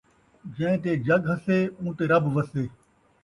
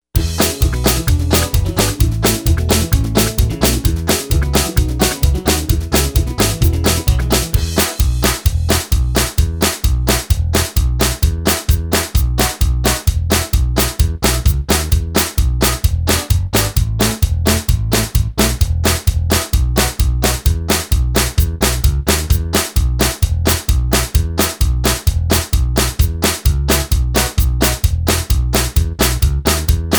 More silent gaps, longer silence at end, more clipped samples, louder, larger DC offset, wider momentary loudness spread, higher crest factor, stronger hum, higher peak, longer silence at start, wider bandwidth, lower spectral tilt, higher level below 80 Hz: neither; first, 0.55 s vs 0 s; neither; second, -25 LUFS vs -15 LUFS; neither; first, 11 LU vs 2 LU; about the same, 18 dB vs 14 dB; neither; second, -8 dBFS vs 0 dBFS; first, 0.45 s vs 0.15 s; second, 11 kHz vs over 20 kHz; first, -8.5 dB/octave vs -4 dB/octave; second, -58 dBFS vs -18 dBFS